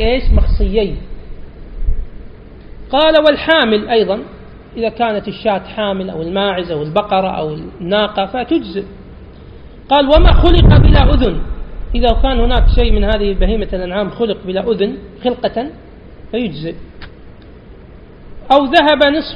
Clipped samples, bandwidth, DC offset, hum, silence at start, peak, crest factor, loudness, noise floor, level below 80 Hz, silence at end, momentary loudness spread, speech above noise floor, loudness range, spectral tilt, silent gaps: under 0.1%; 5.4 kHz; under 0.1%; none; 0 s; 0 dBFS; 14 dB; -14 LUFS; -36 dBFS; -18 dBFS; 0 s; 16 LU; 24 dB; 8 LU; -8.5 dB/octave; none